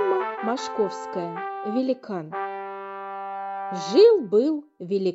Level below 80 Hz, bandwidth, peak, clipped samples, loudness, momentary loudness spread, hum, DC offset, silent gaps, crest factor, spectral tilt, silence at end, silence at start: -78 dBFS; 8 kHz; -6 dBFS; under 0.1%; -24 LUFS; 17 LU; none; under 0.1%; none; 18 dB; -5.5 dB/octave; 0 s; 0 s